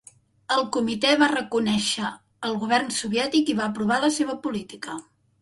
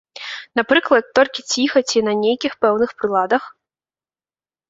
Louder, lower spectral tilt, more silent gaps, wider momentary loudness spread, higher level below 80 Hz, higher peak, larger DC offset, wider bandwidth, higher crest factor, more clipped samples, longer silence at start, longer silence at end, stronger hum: second, -24 LUFS vs -18 LUFS; about the same, -3.5 dB/octave vs -3 dB/octave; neither; first, 12 LU vs 7 LU; about the same, -62 dBFS vs -62 dBFS; second, -6 dBFS vs 0 dBFS; neither; first, 11.5 kHz vs 8 kHz; about the same, 20 dB vs 18 dB; neither; first, 0.5 s vs 0.15 s; second, 0.4 s vs 1.2 s; neither